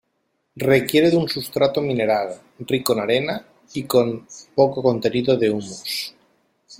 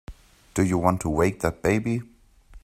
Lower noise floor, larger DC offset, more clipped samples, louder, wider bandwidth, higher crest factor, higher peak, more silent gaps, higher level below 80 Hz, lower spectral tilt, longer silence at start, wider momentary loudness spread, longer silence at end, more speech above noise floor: first, -71 dBFS vs -50 dBFS; neither; neither; first, -20 LUFS vs -24 LUFS; about the same, 16.5 kHz vs 15.5 kHz; about the same, 20 dB vs 22 dB; about the same, -2 dBFS vs -4 dBFS; neither; second, -60 dBFS vs -44 dBFS; second, -5 dB/octave vs -6.5 dB/octave; first, 0.55 s vs 0.1 s; first, 14 LU vs 8 LU; about the same, 0.05 s vs 0.05 s; first, 51 dB vs 27 dB